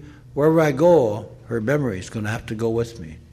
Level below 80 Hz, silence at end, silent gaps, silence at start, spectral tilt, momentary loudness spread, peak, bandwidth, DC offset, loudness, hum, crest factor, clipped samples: -48 dBFS; 0.1 s; none; 0 s; -7 dB/octave; 15 LU; -4 dBFS; 14 kHz; under 0.1%; -21 LUFS; none; 16 dB; under 0.1%